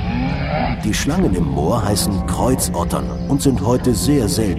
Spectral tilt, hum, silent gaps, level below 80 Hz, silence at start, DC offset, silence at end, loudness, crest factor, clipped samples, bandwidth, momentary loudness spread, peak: -5.5 dB/octave; none; none; -28 dBFS; 0 s; under 0.1%; 0 s; -18 LUFS; 14 dB; under 0.1%; 16 kHz; 4 LU; -2 dBFS